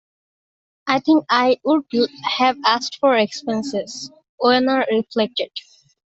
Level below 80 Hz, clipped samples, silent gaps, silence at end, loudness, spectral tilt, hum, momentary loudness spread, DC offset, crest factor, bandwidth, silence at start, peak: -66 dBFS; under 0.1%; 4.29-4.38 s; 0.55 s; -19 LUFS; -4 dB/octave; none; 13 LU; under 0.1%; 18 dB; 8 kHz; 0.85 s; -2 dBFS